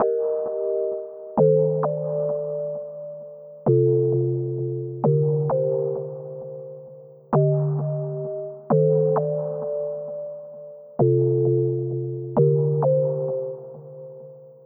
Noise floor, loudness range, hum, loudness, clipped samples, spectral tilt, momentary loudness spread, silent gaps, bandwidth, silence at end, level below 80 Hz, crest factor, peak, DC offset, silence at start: -44 dBFS; 3 LU; none; -23 LUFS; under 0.1%; -15.5 dB/octave; 18 LU; none; 1.9 kHz; 0.1 s; -68 dBFS; 16 dB; -6 dBFS; under 0.1%; 0 s